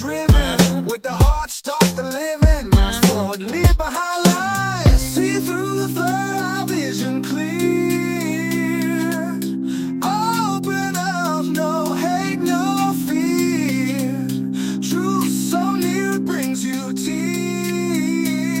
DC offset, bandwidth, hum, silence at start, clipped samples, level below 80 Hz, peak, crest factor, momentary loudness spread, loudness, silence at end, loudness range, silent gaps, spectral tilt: under 0.1%; 17 kHz; none; 0 s; under 0.1%; -26 dBFS; 0 dBFS; 18 dB; 6 LU; -19 LUFS; 0 s; 3 LU; none; -5 dB/octave